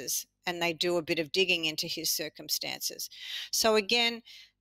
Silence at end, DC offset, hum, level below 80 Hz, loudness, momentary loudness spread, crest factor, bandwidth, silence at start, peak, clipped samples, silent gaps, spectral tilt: 0.15 s; under 0.1%; none; -70 dBFS; -29 LUFS; 11 LU; 18 dB; 16 kHz; 0 s; -12 dBFS; under 0.1%; none; -1.5 dB/octave